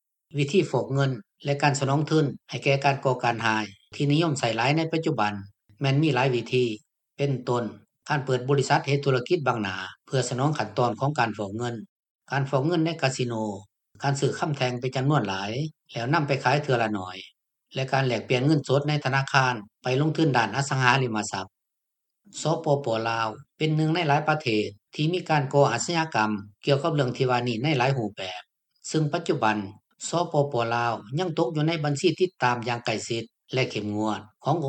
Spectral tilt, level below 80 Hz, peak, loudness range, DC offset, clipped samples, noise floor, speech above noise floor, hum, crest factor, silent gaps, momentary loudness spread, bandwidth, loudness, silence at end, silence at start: -5.5 dB/octave; -68 dBFS; -2 dBFS; 3 LU; under 0.1%; under 0.1%; -83 dBFS; 58 dB; none; 24 dB; 11.89-12.03 s, 12.10-12.19 s; 9 LU; 9.2 kHz; -25 LUFS; 0 s; 0.35 s